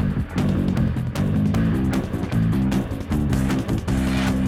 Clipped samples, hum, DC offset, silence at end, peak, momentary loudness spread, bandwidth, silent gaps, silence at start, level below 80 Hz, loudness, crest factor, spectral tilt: under 0.1%; none; under 0.1%; 0 s; -8 dBFS; 4 LU; 15.5 kHz; none; 0 s; -32 dBFS; -22 LUFS; 12 dB; -7.5 dB/octave